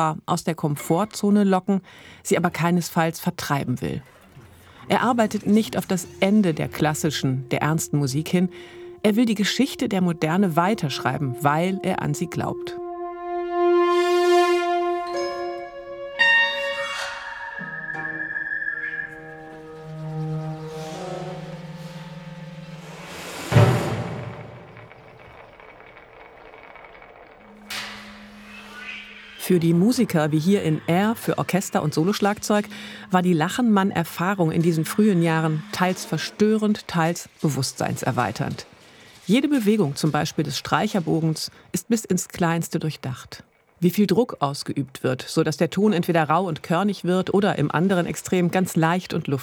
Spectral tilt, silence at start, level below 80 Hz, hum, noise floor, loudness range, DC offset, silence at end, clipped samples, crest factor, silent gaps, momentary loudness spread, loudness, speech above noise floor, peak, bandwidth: -5.5 dB/octave; 0 s; -58 dBFS; none; -48 dBFS; 9 LU; under 0.1%; 0 s; under 0.1%; 20 dB; none; 17 LU; -22 LUFS; 26 dB; -2 dBFS; 19.5 kHz